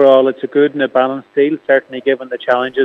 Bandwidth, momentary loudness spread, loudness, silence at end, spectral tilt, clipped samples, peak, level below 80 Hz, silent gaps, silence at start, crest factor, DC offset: 4.3 kHz; 6 LU; -15 LUFS; 0 s; -7 dB/octave; under 0.1%; 0 dBFS; -68 dBFS; none; 0 s; 14 dB; under 0.1%